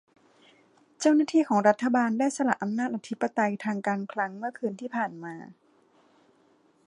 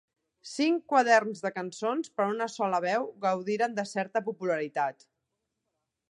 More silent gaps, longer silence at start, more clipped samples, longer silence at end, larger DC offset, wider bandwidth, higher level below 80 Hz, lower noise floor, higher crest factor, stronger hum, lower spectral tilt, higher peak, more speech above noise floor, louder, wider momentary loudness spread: neither; first, 1 s vs 0.45 s; neither; first, 1.35 s vs 1.2 s; neither; about the same, 11 kHz vs 11.5 kHz; about the same, -80 dBFS vs -84 dBFS; second, -64 dBFS vs -83 dBFS; about the same, 22 dB vs 22 dB; neither; about the same, -5.5 dB/octave vs -4.5 dB/octave; about the same, -6 dBFS vs -8 dBFS; second, 37 dB vs 55 dB; about the same, -27 LUFS vs -29 LUFS; about the same, 10 LU vs 10 LU